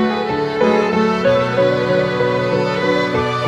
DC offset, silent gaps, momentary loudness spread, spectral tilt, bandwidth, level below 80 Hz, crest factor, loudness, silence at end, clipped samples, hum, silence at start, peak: under 0.1%; none; 3 LU; -6.5 dB/octave; 11 kHz; -48 dBFS; 12 dB; -16 LUFS; 0 s; under 0.1%; none; 0 s; -4 dBFS